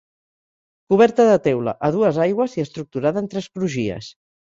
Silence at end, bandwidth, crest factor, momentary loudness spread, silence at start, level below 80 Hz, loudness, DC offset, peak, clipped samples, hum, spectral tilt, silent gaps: 0.45 s; 7.8 kHz; 18 dB; 12 LU; 0.9 s; -58 dBFS; -19 LUFS; under 0.1%; -2 dBFS; under 0.1%; none; -7 dB/octave; none